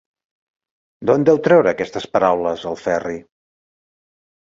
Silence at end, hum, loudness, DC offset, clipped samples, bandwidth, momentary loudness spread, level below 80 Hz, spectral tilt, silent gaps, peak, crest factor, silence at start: 1.3 s; none; -17 LUFS; under 0.1%; under 0.1%; 7.6 kHz; 11 LU; -56 dBFS; -6.5 dB/octave; none; -2 dBFS; 18 dB; 1 s